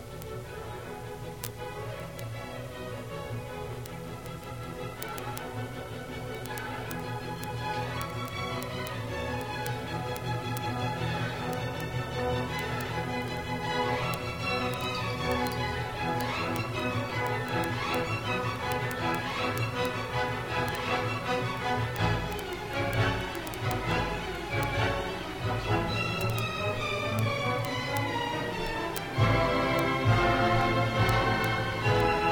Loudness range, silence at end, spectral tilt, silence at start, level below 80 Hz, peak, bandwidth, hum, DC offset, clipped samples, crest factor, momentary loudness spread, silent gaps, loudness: 11 LU; 0 s; -5.5 dB/octave; 0 s; -46 dBFS; -6 dBFS; 19.5 kHz; none; 0.1%; under 0.1%; 24 dB; 12 LU; none; -31 LUFS